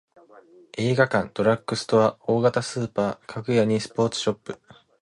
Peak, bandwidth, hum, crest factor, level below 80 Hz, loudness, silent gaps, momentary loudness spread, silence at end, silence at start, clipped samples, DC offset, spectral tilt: -6 dBFS; 11.5 kHz; none; 18 dB; -60 dBFS; -23 LUFS; none; 12 LU; 0.5 s; 0.75 s; under 0.1%; under 0.1%; -5.5 dB/octave